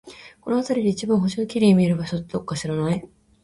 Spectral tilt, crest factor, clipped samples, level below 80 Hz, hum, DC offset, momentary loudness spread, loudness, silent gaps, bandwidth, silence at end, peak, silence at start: -7 dB/octave; 16 dB; under 0.1%; -54 dBFS; none; under 0.1%; 11 LU; -22 LUFS; none; 11.5 kHz; 0.4 s; -6 dBFS; 0.05 s